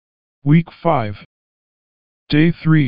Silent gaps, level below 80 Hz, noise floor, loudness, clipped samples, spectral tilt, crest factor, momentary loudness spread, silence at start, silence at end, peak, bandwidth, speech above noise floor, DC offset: 1.25-2.27 s; -48 dBFS; under -90 dBFS; -17 LUFS; under 0.1%; -11 dB/octave; 16 dB; 12 LU; 0.4 s; 0 s; -2 dBFS; 5.2 kHz; over 75 dB; under 0.1%